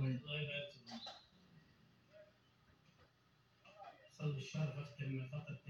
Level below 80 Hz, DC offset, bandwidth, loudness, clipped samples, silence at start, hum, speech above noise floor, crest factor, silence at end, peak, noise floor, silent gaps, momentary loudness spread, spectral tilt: -80 dBFS; under 0.1%; 7.4 kHz; -45 LUFS; under 0.1%; 0 s; none; 29 dB; 18 dB; 0 s; -30 dBFS; -74 dBFS; none; 22 LU; -6.5 dB/octave